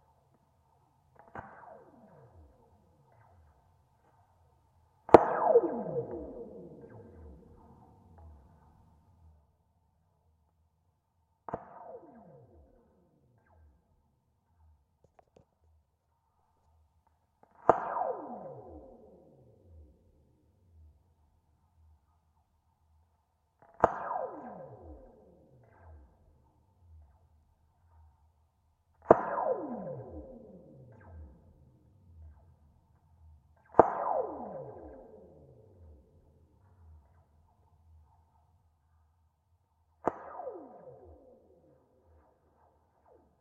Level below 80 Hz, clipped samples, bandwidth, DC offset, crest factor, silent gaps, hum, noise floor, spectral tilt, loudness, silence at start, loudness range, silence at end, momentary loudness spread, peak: -64 dBFS; under 0.1%; 7.8 kHz; under 0.1%; 38 dB; none; none; -76 dBFS; -8 dB/octave; -30 LUFS; 1.35 s; 26 LU; 2.45 s; 29 LU; 0 dBFS